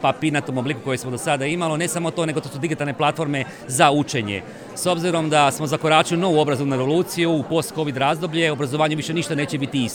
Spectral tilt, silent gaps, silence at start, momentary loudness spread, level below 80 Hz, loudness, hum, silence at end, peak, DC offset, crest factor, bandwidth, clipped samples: -4.5 dB/octave; none; 0 s; 8 LU; -60 dBFS; -21 LUFS; none; 0 s; -2 dBFS; under 0.1%; 20 dB; over 20 kHz; under 0.1%